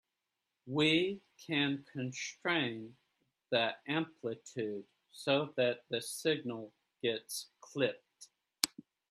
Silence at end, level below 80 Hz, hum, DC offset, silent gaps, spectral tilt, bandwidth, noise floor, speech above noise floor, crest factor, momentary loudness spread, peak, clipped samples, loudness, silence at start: 0.45 s; -80 dBFS; none; under 0.1%; none; -4 dB/octave; 13.5 kHz; -88 dBFS; 52 dB; 30 dB; 14 LU; -6 dBFS; under 0.1%; -35 LUFS; 0.65 s